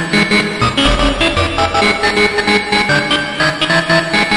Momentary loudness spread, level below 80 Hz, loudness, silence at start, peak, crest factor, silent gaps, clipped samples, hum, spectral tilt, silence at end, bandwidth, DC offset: 3 LU; -26 dBFS; -12 LUFS; 0 s; 0 dBFS; 14 dB; none; under 0.1%; none; -4 dB/octave; 0 s; 11.5 kHz; under 0.1%